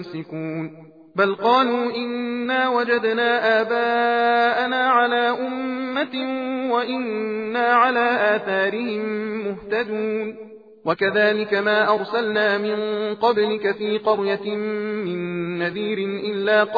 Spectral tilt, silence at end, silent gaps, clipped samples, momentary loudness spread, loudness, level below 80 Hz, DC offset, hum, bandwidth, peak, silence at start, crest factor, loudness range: -7 dB/octave; 0 s; none; under 0.1%; 9 LU; -21 LUFS; -68 dBFS; under 0.1%; none; 5 kHz; -4 dBFS; 0 s; 16 dB; 4 LU